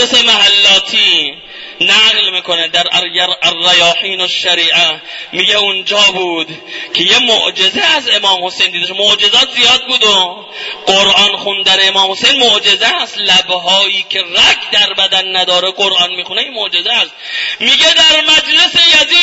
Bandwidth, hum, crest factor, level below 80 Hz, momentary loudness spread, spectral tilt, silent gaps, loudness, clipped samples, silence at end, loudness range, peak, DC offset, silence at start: 11 kHz; none; 10 dB; -50 dBFS; 10 LU; -0.5 dB/octave; none; -8 LUFS; under 0.1%; 0 s; 2 LU; 0 dBFS; under 0.1%; 0 s